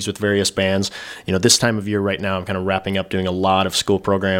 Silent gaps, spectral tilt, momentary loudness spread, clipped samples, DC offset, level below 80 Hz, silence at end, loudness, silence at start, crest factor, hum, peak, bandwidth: none; -3.5 dB/octave; 8 LU; under 0.1%; under 0.1%; -52 dBFS; 0 s; -19 LUFS; 0 s; 20 dB; none; 0 dBFS; 17 kHz